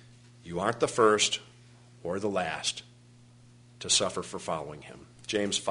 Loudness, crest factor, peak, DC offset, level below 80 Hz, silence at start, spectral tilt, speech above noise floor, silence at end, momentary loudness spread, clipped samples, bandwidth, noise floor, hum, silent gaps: -29 LUFS; 24 dB; -8 dBFS; under 0.1%; -64 dBFS; 0.45 s; -2.5 dB/octave; 26 dB; 0 s; 18 LU; under 0.1%; 11 kHz; -56 dBFS; 60 Hz at -55 dBFS; none